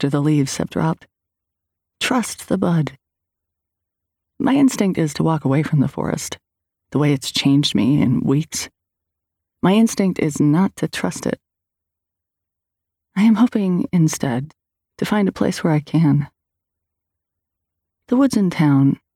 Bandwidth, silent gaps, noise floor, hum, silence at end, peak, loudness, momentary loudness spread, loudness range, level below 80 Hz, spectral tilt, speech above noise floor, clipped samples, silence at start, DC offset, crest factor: 16.5 kHz; none; -83 dBFS; none; 0.2 s; -6 dBFS; -18 LUFS; 10 LU; 4 LU; -54 dBFS; -6 dB/octave; 66 dB; under 0.1%; 0 s; under 0.1%; 14 dB